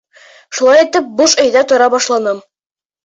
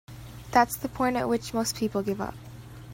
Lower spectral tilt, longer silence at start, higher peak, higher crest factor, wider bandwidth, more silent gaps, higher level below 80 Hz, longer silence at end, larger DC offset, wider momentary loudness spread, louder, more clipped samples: second, -1 dB/octave vs -4.5 dB/octave; first, 0.5 s vs 0.1 s; first, 0 dBFS vs -6 dBFS; second, 12 dB vs 22 dB; second, 8 kHz vs 16.5 kHz; neither; second, -58 dBFS vs -52 dBFS; first, 0.65 s vs 0 s; neither; second, 10 LU vs 21 LU; first, -11 LUFS vs -27 LUFS; neither